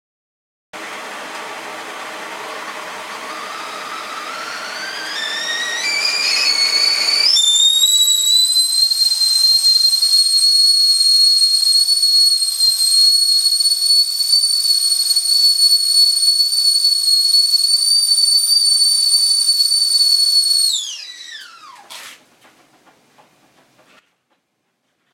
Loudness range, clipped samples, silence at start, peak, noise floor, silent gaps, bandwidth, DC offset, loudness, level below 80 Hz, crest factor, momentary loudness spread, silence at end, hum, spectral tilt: 17 LU; under 0.1%; 0.75 s; -2 dBFS; -69 dBFS; none; 16.5 kHz; under 0.1%; -11 LUFS; -82 dBFS; 14 dB; 19 LU; 3 s; none; 4 dB/octave